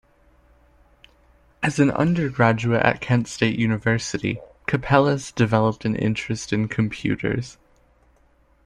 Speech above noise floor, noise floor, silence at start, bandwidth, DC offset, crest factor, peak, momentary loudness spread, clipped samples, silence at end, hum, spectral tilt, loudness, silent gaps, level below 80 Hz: 38 dB; -59 dBFS; 1.6 s; 11 kHz; under 0.1%; 20 dB; -2 dBFS; 8 LU; under 0.1%; 1.15 s; none; -6 dB/octave; -22 LUFS; none; -48 dBFS